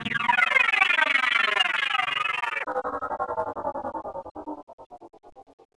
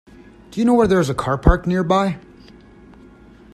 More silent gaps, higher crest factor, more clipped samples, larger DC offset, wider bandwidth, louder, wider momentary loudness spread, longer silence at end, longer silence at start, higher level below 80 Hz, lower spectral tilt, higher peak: first, 4.31-4.35 s, 4.63-4.67 s, 4.73-4.78 s, 4.86-4.90 s vs none; about the same, 20 dB vs 20 dB; neither; neither; second, 11 kHz vs 13 kHz; second, -23 LUFS vs -18 LUFS; first, 18 LU vs 10 LU; second, 0.35 s vs 1.35 s; second, 0 s vs 0.5 s; second, -62 dBFS vs -28 dBFS; second, -2 dB/octave vs -7 dB/octave; second, -6 dBFS vs 0 dBFS